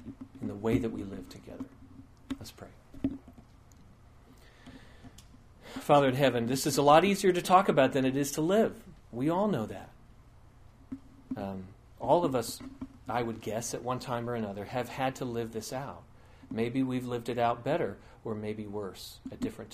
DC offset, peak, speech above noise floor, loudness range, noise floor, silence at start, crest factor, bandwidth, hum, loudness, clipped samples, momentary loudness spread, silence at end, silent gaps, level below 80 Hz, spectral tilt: under 0.1%; -8 dBFS; 26 dB; 18 LU; -56 dBFS; 0 s; 24 dB; 15.5 kHz; none; -30 LUFS; under 0.1%; 21 LU; 0.05 s; none; -58 dBFS; -5.5 dB/octave